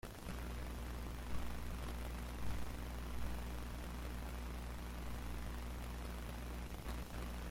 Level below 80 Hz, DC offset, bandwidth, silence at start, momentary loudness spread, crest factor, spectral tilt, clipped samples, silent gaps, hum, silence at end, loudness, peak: -46 dBFS; under 0.1%; 16.5 kHz; 0.05 s; 2 LU; 16 dB; -5.5 dB/octave; under 0.1%; none; 60 Hz at -45 dBFS; 0 s; -47 LUFS; -28 dBFS